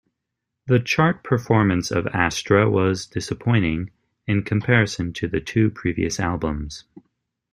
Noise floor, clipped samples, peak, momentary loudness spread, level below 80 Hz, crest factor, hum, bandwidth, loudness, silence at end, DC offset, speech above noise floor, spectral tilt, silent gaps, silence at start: -81 dBFS; under 0.1%; -2 dBFS; 11 LU; -44 dBFS; 20 dB; none; 12.5 kHz; -21 LUFS; 0.55 s; under 0.1%; 60 dB; -6 dB/octave; none; 0.65 s